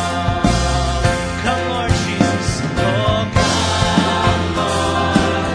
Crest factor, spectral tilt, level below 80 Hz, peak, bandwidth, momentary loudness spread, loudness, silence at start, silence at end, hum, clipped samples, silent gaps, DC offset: 16 dB; -5 dB/octave; -28 dBFS; 0 dBFS; 10.5 kHz; 4 LU; -17 LUFS; 0 s; 0 s; none; under 0.1%; none; under 0.1%